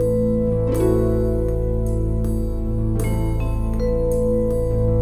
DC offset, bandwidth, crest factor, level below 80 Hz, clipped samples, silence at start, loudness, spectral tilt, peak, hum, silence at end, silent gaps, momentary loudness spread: 0.2%; 12.5 kHz; 12 dB; -24 dBFS; under 0.1%; 0 s; -21 LUFS; -9 dB/octave; -6 dBFS; none; 0 s; none; 5 LU